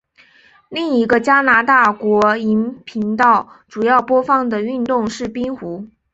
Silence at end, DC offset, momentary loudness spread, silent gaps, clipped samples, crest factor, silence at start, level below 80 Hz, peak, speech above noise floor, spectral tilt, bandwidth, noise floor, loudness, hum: 0.25 s; under 0.1%; 12 LU; none; under 0.1%; 16 dB; 0.7 s; -54 dBFS; -2 dBFS; 35 dB; -5.5 dB/octave; 8 kHz; -50 dBFS; -15 LUFS; none